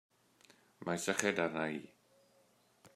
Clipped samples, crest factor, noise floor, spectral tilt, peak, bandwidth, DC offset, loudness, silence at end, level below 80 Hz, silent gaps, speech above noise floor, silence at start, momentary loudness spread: under 0.1%; 28 dB; -71 dBFS; -3.5 dB/octave; -12 dBFS; 15 kHz; under 0.1%; -37 LUFS; 0.1 s; -82 dBFS; none; 34 dB; 0.8 s; 12 LU